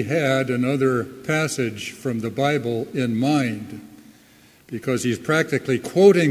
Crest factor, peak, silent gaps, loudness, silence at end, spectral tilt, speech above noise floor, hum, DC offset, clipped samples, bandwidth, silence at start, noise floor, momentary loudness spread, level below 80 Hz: 20 dB; -2 dBFS; none; -21 LUFS; 0 s; -5.5 dB/octave; 31 dB; none; under 0.1%; under 0.1%; 16 kHz; 0 s; -52 dBFS; 10 LU; -60 dBFS